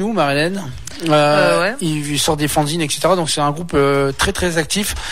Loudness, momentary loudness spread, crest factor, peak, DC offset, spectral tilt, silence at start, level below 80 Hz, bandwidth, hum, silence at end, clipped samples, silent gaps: -16 LUFS; 6 LU; 16 dB; -2 dBFS; 2%; -4 dB/octave; 0 s; -36 dBFS; 16 kHz; none; 0 s; under 0.1%; none